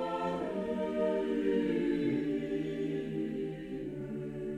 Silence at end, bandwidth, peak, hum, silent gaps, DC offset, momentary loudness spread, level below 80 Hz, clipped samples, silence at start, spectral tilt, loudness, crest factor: 0 s; 10.5 kHz; -20 dBFS; none; none; under 0.1%; 9 LU; -60 dBFS; under 0.1%; 0 s; -8 dB/octave; -34 LUFS; 14 dB